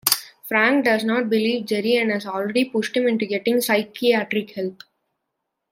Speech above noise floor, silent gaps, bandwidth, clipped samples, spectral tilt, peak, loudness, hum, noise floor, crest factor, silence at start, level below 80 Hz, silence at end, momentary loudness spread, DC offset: 58 dB; none; 16.5 kHz; under 0.1%; -3.5 dB/octave; 0 dBFS; -21 LUFS; none; -79 dBFS; 22 dB; 0.05 s; -72 dBFS; 1 s; 7 LU; under 0.1%